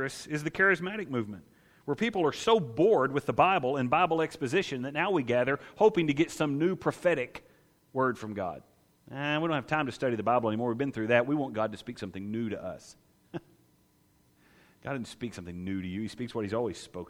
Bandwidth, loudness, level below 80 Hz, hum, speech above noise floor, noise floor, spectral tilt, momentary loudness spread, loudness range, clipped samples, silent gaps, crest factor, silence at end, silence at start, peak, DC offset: 15.5 kHz; -29 LUFS; -64 dBFS; none; 37 dB; -66 dBFS; -6 dB/octave; 15 LU; 13 LU; under 0.1%; none; 22 dB; 0.05 s; 0 s; -8 dBFS; under 0.1%